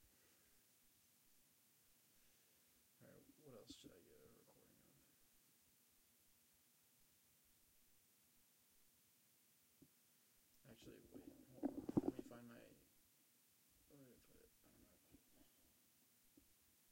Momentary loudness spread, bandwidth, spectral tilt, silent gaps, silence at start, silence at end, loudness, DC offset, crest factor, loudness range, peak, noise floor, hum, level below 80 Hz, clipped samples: 24 LU; 16.5 kHz; -6 dB/octave; none; 0 s; 0 s; -51 LUFS; under 0.1%; 34 dB; 16 LU; -26 dBFS; -77 dBFS; none; -84 dBFS; under 0.1%